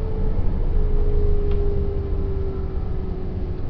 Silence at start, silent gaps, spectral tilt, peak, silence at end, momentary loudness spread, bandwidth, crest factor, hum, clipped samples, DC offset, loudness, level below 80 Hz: 0 s; none; -11 dB/octave; -8 dBFS; 0 s; 5 LU; 3.4 kHz; 12 dB; none; under 0.1%; under 0.1%; -26 LUFS; -20 dBFS